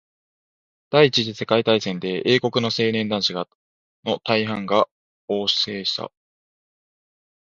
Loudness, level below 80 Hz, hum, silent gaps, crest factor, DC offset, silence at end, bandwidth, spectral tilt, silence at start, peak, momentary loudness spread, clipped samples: -21 LUFS; -64 dBFS; none; 3.55-4.03 s, 4.91-5.28 s; 22 dB; under 0.1%; 1.4 s; 7.6 kHz; -5 dB/octave; 0.9 s; 0 dBFS; 10 LU; under 0.1%